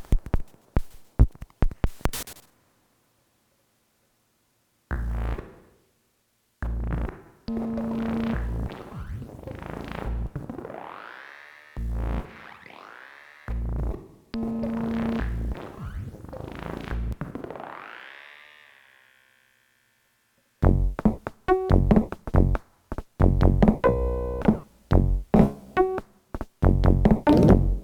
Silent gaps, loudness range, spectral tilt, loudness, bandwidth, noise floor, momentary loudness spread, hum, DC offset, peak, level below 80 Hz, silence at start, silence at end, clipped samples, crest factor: none; 15 LU; -8 dB/octave; -26 LUFS; 19 kHz; -70 dBFS; 21 LU; none; under 0.1%; -2 dBFS; -30 dBFS; 0 s; 0 s; under 0.1%; 24 dB